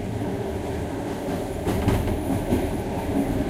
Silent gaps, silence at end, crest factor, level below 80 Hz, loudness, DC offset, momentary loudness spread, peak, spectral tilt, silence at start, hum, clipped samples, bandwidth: none; 0 s; 16 dB; -34 dBFS; -26 LUFS; under 0.1%; 6 LU; -8 dBFS; -7 dB/octave; 0 s; none; under 0.1%; 16 kHz